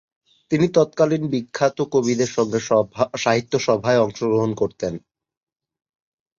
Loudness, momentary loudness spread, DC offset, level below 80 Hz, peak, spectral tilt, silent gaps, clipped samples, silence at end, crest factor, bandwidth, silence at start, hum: -20 LUFS; 6 LU; under 0.1%; -58 dBFS; -4 dBFS; -5.5 dB/octave; none; under 0.1%; 1.4 s; 18 dB; 7.6 kHz; 0.5 s; none